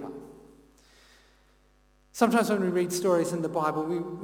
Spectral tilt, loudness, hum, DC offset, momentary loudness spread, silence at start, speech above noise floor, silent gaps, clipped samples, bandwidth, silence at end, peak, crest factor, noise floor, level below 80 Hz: -5.5 dB/octave; -27 LUFS; 50 Hz at -65 dBFS; under 0.1%; 16 LU; 0 s; 37 dB; none; under 0.1%; 17.5 kHz; 0 s; -10 dBFS; 20 dB; -63 dBFS; -64 dBFS